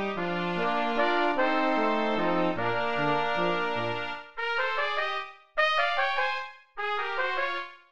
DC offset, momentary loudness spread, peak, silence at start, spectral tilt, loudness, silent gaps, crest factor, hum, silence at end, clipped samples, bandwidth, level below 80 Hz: 1%; 8 LU; -12 dBFS; 0 s; -5.5 dB/octave; -28 LUFS; none; 16 dB; none; 0 s; under 0.1%; 8.8 kHz; -64 dBFS